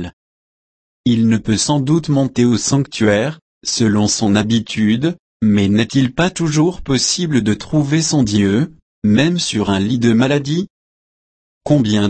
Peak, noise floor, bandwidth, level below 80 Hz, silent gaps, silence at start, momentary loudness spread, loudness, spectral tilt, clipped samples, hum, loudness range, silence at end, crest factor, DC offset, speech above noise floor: -2 dBFS; under -90 dBFS; 8.8 kHz; -44 dBFS; 0.13-1.04 s, 3.42-3.61 s, 5.19-5.40 s, 8.82-9.02 s, 10.70-11.61 s; 0 s; 7 LU; -16 LUFS; -5 dB/octave; under 0.1%; none; 1 LU; 0 s; 14 dB; under 0.1%; over 75 dB